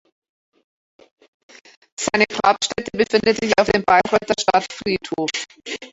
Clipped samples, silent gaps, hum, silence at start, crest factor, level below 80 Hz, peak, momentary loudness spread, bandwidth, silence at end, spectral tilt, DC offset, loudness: under 0.1%; none; none; 2 s; 20 dB; -52 dBFS; -2 dBFS; 11 LU; 8.2 kHz; 0.05 s; -3 dB/octave; under 0.1%; -19 LUFS